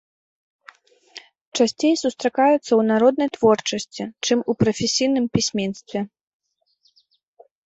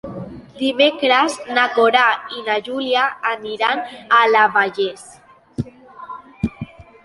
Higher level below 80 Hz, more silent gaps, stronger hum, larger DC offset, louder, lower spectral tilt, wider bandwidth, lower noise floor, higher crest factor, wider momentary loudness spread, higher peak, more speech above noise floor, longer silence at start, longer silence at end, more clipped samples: second, -58 dBFS vs -50 dBFS; first, 1.41-1.52 s vs none; neither; neither; second, -20 LUFS vs -17 LUFS; about the same, -4.5 dB/octave vs -4 dB/octave; second, 8.2 kHz vs 11.5 kHz; first, -65 dBFS vs -37 dBFS; about the same, 18 dB vs 18 dB; second, 12 LU vs 21 LU; about the same, -4 dBFS vs -2 dBFS; first, 45 dB vs 19 dB; first, 1.15 s vs 0.05 s; first, 1.6 s vs 0.25 s; neither